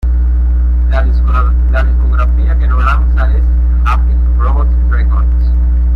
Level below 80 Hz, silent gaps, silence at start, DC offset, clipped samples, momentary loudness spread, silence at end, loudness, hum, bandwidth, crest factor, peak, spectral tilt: -8 dBFS; none; 0 s; under 0.1%; under 0.1%; 1 LU; 0 s; -12 LUFS; none; 4.1 kHz; 8 dB; -2 dBFS; -9 dB/octave